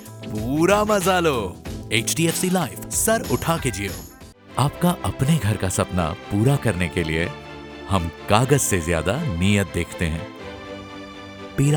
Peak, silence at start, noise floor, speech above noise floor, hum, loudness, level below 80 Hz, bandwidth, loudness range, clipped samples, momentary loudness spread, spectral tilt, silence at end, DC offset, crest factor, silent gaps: 0 dBFS; 0 s; -43 dBFS; 22 dB; none; -22 LUFS; -40 dBFS; over 20 kHz; 2 LU; under 0.1%; 17 LU; -5 dB/octave; 0 s; under 0.1%; 22 dB; none